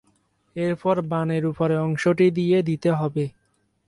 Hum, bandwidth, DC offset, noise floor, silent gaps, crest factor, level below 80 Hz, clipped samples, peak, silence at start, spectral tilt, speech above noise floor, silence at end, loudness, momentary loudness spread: none; 11.5 kHz; under 0.1%; -68 dBFS; none; 14 dB; -60 dBFS; under 0.1%; -8 dBFS; 0.55 s; -8 dB/octave; 47 dB; 0.6 s; -23 LUFS; 9 LU